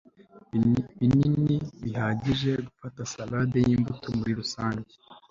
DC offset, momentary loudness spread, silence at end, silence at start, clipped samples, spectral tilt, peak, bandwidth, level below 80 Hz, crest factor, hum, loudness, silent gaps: under 0.1%; 13 LU; 0.1 s; 0.35 s; under 0.1%; -6.5 dB/octave; -12 dBFS; 7.6 kHz; -52 dBFS; 14 dB; none; -27 LUFS; none